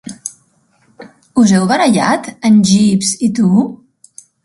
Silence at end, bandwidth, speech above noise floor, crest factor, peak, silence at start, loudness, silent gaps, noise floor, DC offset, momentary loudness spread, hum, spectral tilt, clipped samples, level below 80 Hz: 0.7 s; 11.5 kHz; 45 dB; 14 dB; 0 dBFS; 0.05 s; -12 LUFS; none; -55 dBFS; under 0.1%; 13 LU; none; -5 dB/octave; under 0.1%; -52 dBFS